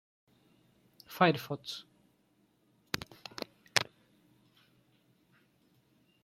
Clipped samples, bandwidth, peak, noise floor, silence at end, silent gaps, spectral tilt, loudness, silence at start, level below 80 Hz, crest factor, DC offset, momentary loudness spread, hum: under 0.1%; 16 kHz; -2 dBFS; -72 dBFS; 2.4 s; none; -4 dB/octave; -34 LUFS; 1.1 s; -74 dBFS; 38 dB; under 0.1%; 17 LU; none